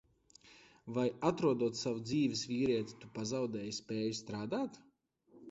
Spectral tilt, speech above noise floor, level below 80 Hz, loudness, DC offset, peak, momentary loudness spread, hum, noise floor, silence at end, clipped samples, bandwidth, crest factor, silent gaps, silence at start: -5.5 dB/octave; 31 dB; -70 dBFS; -37 LUFS; under 0.1%; -16 dBFS; 9 LU; none; -67 dBFS; 0 s; under 0.1%; 8 kHz; 20 dB; none; 0.45 s